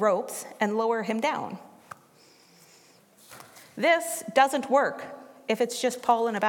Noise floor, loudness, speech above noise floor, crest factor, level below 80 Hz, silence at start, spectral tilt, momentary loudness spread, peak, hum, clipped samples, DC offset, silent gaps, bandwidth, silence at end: -57 dBFS; -26 LUFS; 32 dB; 22 dB; -84 dBFS; 0 s; -3.5 dB/octave; 24 LU; -6 dBFS; none; under 0.1%; under 0.1%; none; 17.5 kHz; 0 s